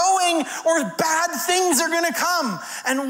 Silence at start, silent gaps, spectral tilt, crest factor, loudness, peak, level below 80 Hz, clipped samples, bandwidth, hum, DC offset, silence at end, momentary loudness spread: 0 s; none; -1.5 dB/octave; 16 dB; -20 LUFS; -6 dBFS; -72 dBFS; under 0.1%; 16.5 kHz; none; under 0.1%; 0 s; 6 LU